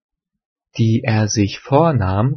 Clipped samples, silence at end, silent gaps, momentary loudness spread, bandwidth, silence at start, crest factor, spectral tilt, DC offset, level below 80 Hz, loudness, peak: under 0.1%; 0 s; none; 5 LU; 6.6 kHz; 0.75 s; 18 dB; -6 dB/octave; under 0.1%; -52 dBFS; -17 LUFS; 0 dBFS